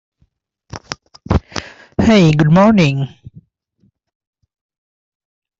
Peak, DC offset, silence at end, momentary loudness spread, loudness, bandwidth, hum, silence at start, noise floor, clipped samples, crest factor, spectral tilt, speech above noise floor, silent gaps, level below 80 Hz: -2 dBFS; under 0.1%; 2.55 s; 20 LU; -13 LUFS; 7.8 kHz; none; 0.75 s; -62 dBFS; under 0.1%; 16 dB; -7 dB/octave; 51 dB; none; -36 dBFS